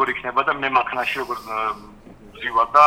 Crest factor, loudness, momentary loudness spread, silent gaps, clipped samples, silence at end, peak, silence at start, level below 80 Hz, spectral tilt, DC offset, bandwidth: 18 dB; -22 LUFS; 8 LU; none; under 0.1%; 0 s; -2 dBFS; 0 s; -52 dBFS; -4 dB/octave; under 0.1%; 16.5 kHz